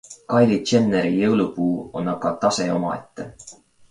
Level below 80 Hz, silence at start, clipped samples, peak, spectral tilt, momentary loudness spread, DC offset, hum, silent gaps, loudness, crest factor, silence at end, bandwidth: -56 dBFS; 0.1 s; under 0.1%; -4 dBFS; -5.5 dB/octave; 13 LU; under 0.1%; none; none; -21 LUFS; 16 dB; 0.4 s; 11 kHz